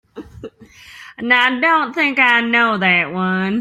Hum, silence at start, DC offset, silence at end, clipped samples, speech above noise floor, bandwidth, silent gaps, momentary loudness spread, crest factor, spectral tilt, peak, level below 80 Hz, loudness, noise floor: none; 0.15 s; under 0.1%; 0 s; under 0.1%; 27 dB; 13.5 kHz; none; 7 LU; 16 dB; -5.5 dB/octave; -2 dBFS; -56 dBFS; -14 LUFS; -42 dBFS